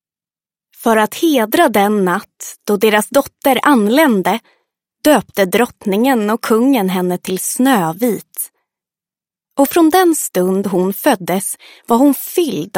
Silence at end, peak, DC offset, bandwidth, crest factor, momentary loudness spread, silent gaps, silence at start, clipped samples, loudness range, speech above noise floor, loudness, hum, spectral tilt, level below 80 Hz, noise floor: 0 s; 0 dBFS; under 0.1%; 17 kHz; 14 dB; 9 LU; none; 0.8 s; under 0.1%; 2 LU; over 76 dB; -14 LUFS; none; -4.5 dB/octave; -58 dBFS; under -90 dBFS